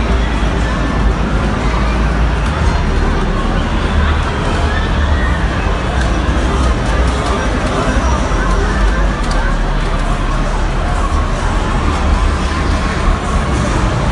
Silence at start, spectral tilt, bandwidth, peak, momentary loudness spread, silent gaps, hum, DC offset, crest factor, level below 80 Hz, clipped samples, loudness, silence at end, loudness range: 0 s; -6 dB/octave; 11 kHz; 0 dBFS; 2 LU; none; none; under 0.1%; 12 dB; -16 dBFS; under 0.1%; -16 LUFS; 0 s; 1 LU